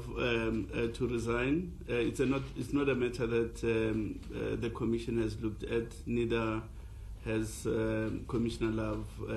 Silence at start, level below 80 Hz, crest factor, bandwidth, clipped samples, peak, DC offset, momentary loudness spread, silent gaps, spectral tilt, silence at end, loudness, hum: 0 s; -46 dBFS; 16 dB; 13 kHz; under 0.1%; -18 dBFS; under 0.1%; 7 LU; none; -6.5 dB/octave; 0 s; -34 LUFS; none